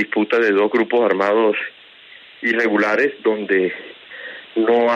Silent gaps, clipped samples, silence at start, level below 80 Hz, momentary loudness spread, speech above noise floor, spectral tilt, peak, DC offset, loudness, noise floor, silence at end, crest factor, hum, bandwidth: none; under 0.1%; 0 s; -74 dBFS; 16 LU; 27 dB; -6 dB/octave; -4 dBFS; under 0.1%; -18 LUFS; -44 dBFS; 0 s; 14 dB; none; 7.4 kHz